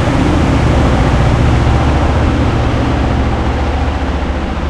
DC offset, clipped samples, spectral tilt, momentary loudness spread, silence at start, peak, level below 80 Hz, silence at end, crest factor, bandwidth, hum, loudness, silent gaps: under 0.1%; under 0.1%; -7 dB/octave; 5 LU; 0 s; 0 dBFS; -16 dBFS; 0 s; 12 dB; 10 kHz; none; -13 LUFS; none